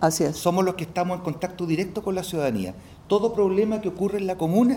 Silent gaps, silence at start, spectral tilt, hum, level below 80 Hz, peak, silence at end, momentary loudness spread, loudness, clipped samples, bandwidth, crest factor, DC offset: none; 0 s; -6 dB/octave; none; -52 dBFS; -6 dBFS; 0 s; 8 LU; -25 LUFS; under 0.1%; 17.5 kHz; 16 dB; under 0.1%